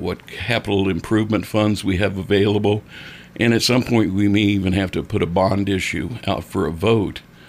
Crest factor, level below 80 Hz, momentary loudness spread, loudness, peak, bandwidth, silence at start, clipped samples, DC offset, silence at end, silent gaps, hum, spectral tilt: 14 dB; -44 dBFS; 8 LU; -19 LUFS; -4 dBFS; 15.5 kHz; 0 s; under 0.1%; under 0.1%; 0.25 s; none; none; -6 dB/octave